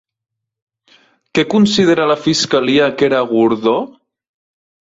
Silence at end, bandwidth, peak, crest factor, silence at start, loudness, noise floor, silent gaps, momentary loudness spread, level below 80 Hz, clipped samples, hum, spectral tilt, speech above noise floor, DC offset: 1.1 s; 8 kHz; -2 dBFS; 14 dB; 1.35 s; -14 LUFS; -52 dBFS; none; 7 LU; -56 dBFS; under 0.1%; none; -4.5 dB/octave; 39 dB; under 0.1%